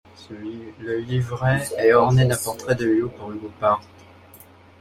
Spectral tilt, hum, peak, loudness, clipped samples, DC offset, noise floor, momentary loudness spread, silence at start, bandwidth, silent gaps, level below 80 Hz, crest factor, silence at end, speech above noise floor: -6 dB/octave; none; -4 dBFS; -21 LUFS; under 0.1%; under 0.1%; -48 dBFS; 18 LU; 0.2 s; 14.5 kHz; none; -52 dBFS; 18 dB; 0.95 s; 27 dB